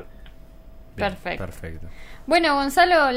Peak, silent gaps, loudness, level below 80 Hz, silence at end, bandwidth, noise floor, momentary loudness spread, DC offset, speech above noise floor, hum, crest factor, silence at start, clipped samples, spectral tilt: -6 dBFS; none; -21 LUFS; -42 dBFS; 0 s; 16 kHz; -43 dBFS; 24 LU; under 0.1%; 22 dB; none; 18 dB; 0 s; under 0.1%; -4 dB/octave